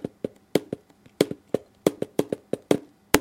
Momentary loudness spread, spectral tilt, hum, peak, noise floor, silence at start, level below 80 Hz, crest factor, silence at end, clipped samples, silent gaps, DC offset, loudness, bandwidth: 10 LU; -4.5 dB/octave; none; 0 dBFS; -40 dBFS; 0.05 s; -62 dBFS; 28 dB; 0 s; under 0.1%; none; under 0.1%; -28 LUFS; 16.5 kHz